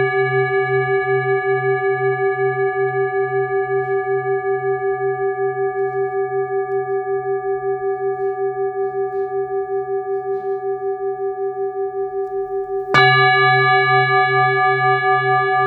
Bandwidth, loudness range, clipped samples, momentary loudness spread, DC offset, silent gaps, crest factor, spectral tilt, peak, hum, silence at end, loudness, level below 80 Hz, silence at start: 6 kHz; 8 LU; under 0.1%; 10 LU; under 0.1%; none; 18 dB; -7 dB/octave; 0 dBFS; none; 0 s; -18 LUFS; -60 dBFS; 0 s